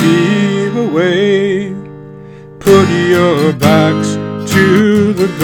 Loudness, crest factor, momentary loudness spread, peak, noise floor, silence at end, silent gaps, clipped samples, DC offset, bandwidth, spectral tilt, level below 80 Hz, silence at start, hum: -11 LUFS; 10 dB; 10 LU; 0 dBFS; -32 dBFS; 0 s; none; 0.5%; under 0.1%; 19 kHz; -6 dB/octave; -46 dBFS; 0 s; none